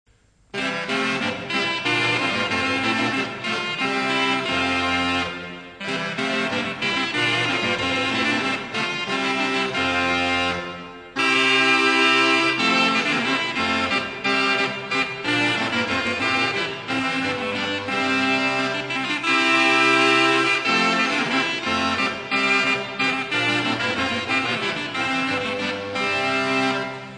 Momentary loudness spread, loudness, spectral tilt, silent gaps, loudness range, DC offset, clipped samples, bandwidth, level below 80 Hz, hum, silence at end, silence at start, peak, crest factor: 9 LU; -20 LUFS; -3.5 dB/octave; none; 4 LU; under 0.1%; under 0.1%; 10 kHz; -58 dBFS; none; 0 s; 0.55 s; -4 dBFS; 18 dB